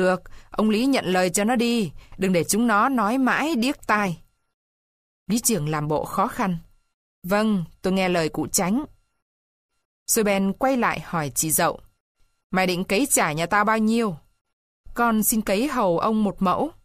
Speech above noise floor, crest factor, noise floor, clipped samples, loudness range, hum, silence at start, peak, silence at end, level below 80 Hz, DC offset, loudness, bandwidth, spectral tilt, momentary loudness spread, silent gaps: over 68 dB; 18 dB; under -90 dBFS; under 0.1%; 4 LU; none; 0 s; -6 dBFS; 0.15 s; -50 dBFS; under 0.1%; -22 LUFS; 15.5 kHz; -4 dB/octave; 8 LU; 4.54-5.26 s, 6.94-7.22 s, 9.22-9.69 s, 9.85-10.06 s, 12.00-12.15 s, 12.44-12.50 s, 14.41-14.45 s, 14.53-14.84 s